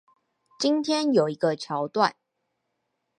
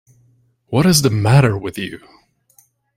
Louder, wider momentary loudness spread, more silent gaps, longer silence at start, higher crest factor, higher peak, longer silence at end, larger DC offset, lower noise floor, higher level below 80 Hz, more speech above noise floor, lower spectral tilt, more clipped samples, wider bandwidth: second, -25 LUFS vs -15 LUFS; second, 6 LU vs 14 LU; neither; about the same, 0.6 s vs 0.7 s; about the same, 22 dB vs 18 dB; second, -6 dBFS vs 0 dBFS; about the same, 1.05 s vs 1 s; neither; first, -78 dBFS vs -57 dBFS; second, -80 dBFS vs -46 dBFS; first, 55 dB vs 42 dB; about the same, -5 dB/octave vs -5 dB/octave; neither; second, 11 kHz vs 16 kHz